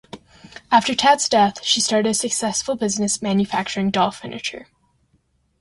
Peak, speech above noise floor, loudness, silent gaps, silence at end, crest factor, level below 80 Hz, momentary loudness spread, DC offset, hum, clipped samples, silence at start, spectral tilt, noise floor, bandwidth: -2 dBFS; 44 dB; -19 LUFS; none; 1 s; 20 dB; -56 dBFS; 12 LU; under 0.1%; none; under 0.1%; 0.15 s; -3 dB/octave; -64 dBFS; 11.5 kHz